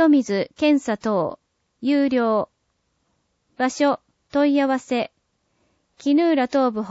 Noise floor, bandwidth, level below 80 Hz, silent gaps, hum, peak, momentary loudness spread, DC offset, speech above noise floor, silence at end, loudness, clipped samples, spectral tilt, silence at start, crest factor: -71 dBFS; 8 kHz; -66 dBFS; none; none; -6 dBFS; 10 LU; under 0.1%; 51 dB; 0 s; -21 LUFS; under 0.1%; -5.5 dB/octave; 0 s; 16 dB